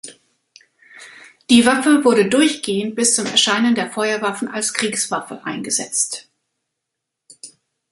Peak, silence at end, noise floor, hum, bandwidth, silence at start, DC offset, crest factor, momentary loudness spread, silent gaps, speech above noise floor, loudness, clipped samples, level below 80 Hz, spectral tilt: 0 dBFS; 0.45 s; -80 dBFS; none; 11.5 kHz; 0.05 s; under 0.1%; 20 dB; 11 LU; none; 63 dB; -17 LUFS; under 0.1%; -62 dBFS; -2.5 dB/octave